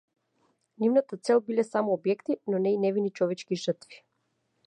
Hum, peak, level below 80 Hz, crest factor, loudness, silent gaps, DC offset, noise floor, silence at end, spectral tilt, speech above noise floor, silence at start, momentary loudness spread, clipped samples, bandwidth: none; -12 dBFS; -84 dBFS; 18 dB; -28 LUFS; none; under 0.1%; -76 dBFS; 0.7 s; -6.5 dB/octave; 49 dB; 0.8 s; 6 LU; under 0.1%; 10 kHz